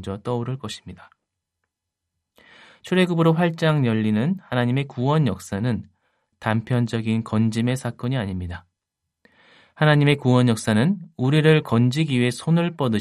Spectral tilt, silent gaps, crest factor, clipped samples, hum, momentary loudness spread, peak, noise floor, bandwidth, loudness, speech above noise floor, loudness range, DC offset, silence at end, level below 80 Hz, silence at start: -7 dB/octave; none; 18 dB; under 0.1%; none; 11 LU; -4 dBFS; -82 dBFS; 13 kHz; -21 LUFS; 62 dB; 6 LU; under 0.1%; 0 s; -60 dBFS; 0 s